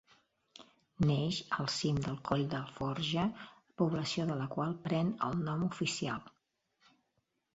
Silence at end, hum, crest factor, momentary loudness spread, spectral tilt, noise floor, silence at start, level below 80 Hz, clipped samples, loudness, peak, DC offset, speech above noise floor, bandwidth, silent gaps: 1.25 s; none; 22 dB; 5 LU; -5 dB/octave; -81 dBFS; 0.6 s; -62 dBFS; under 0.1%; -35 LUFS; -14 dBFS; under 0.1%; 47 dB; 8 kHz; none